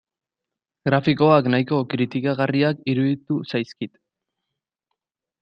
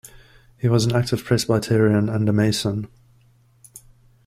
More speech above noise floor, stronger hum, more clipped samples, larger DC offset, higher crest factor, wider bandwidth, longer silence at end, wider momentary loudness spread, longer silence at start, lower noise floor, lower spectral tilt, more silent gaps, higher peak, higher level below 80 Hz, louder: first, 66 dB vs 37 dB; neither; neither; neither; about the same, 20 dB vs 16 dB; second, 6.4 kHz vs 15.5 kHz; first, 1.55 s vs 0.5 s; first, 12 LU vs 8 LU; first, 0.85 s vs 0.65 s; first, -86 dBFS vs -56 dBFS; first, -8.5 dB/octave vs -6 dB/octave; neither; first, -2 dBFS vs -6 dBFS; second, -62 dBFS vs -50 dBFS; about the same, -21 LUFS vs -20 LUFS